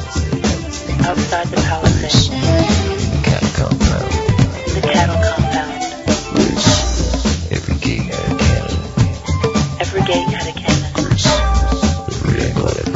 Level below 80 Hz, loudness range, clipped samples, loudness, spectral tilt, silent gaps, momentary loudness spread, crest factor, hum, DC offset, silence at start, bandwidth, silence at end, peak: -24 dBFS; 2 LU; under 0.1%; -16 LUFS; -5 dB/octave; none; 6 LU; 16 dB; none; under 0.1%; 0 s; 8 kHz; 0 s; 0 dBFS